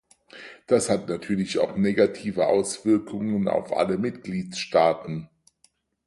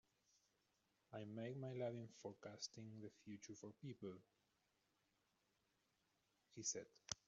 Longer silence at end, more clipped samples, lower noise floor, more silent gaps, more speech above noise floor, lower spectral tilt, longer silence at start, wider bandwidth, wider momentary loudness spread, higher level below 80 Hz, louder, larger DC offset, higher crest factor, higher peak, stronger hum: first, 0.8 s vs 0.15 s; neither; second, -65 dBFS vs -86 dBFS; neither; first, 41 dB vs 33 dB; about the same, -5.5 dB/octave vs -5 dB/octave; second, 0.35 s vs 1.1 s; first, 11.5 kHz vs 7.4 kHz; about the same, 11 LU vs 11 LU; first, -60 dBFS vs -86 dBFS; first, -24 LUFS vs -53 LUFS; neither; second, 18 dB vs 28 dB; first, -6 dBFS vs -28 dBFS; neither